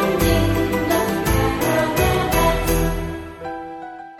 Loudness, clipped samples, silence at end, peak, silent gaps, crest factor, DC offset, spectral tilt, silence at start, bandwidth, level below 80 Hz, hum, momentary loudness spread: -19 LUFS; under 0.1%; 0 s; -4 dBFS; none; 16 dB; under 0.1%; -5 dB/octave; 0 s; 17.5 kHz; -28 dBFS; none; 13 LU